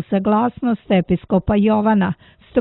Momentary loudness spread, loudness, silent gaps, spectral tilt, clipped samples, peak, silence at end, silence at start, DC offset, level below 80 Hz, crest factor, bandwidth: 7 LU; -18 LUFS; none; -12 dB/octave; under 0.1%; -2 dBFS; 0 s; 0 s; under 0.1%; -40 dBFS; 14 dB; 4.1 kHz